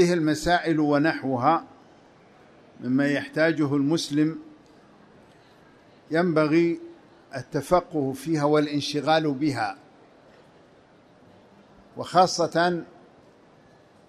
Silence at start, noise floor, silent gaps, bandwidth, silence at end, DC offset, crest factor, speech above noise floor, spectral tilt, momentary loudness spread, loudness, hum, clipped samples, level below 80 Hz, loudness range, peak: 0 s; -55 dBFS; none; 13.5 kHz; 1.25 s; under 0.1%; 20 dB; 32 dB; -5.5 dB/octave; 13 LU; -24 LUFS; none; under 0.1%; -56 dBFS; 3 LU; -6 dBFS